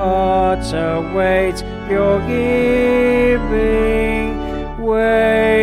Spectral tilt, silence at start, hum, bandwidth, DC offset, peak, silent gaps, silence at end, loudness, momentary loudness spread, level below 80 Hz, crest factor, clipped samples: -6.5 dB/octave; 0 s; none; 14 kHz; under 0.1%; -2 dBFS; none; 0 s; -16 LUFS; 7 LU; -28 dBFS; 12 dB; under 0.1%